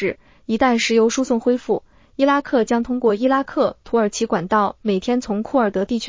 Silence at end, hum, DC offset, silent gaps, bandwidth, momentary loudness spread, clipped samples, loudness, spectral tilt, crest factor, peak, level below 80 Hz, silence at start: 0 s; none; under 0.1%; none; 7.6 kHz; 6 LU; under 0.1%; -19 LUFS; -4.5 dB/octave; 16 dB; -4 dBFS; -50 dBFS; 0 s